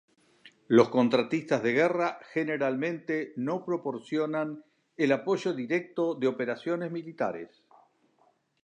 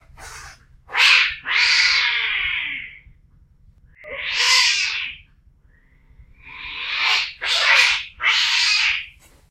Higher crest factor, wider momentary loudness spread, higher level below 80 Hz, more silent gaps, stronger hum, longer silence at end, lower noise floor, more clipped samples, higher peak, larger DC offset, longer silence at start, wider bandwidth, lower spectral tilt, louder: about the same, 22 dB vs 20 dB; second, 9 LU vs 20 LU; second, -80 dBFS vs -52 dBFS; neither; neither; first, 1.2 s vs 0.4 s; first, -68 dBFS vs -54 dBFS; neither; second, -8 dBFS vs -2 dBFS; neither; first, 0.45 s vs 0.2 s; second, 9.2 kHz vs 16 kHz; first, -6.5 dB/octave vs 2.5 dB/octave; second, -29 LUFS vs -16 LUFS